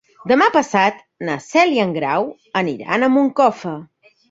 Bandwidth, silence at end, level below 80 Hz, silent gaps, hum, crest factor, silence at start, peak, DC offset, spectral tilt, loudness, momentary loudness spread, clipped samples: 7.8 kHz; 0.45 s; -62 dBFS; none; none; 16 dB; 0.25 s; -2 dBFS; under 0.1%; -5 dB/octave; -17 LUFS; 12 LU; under 0.1%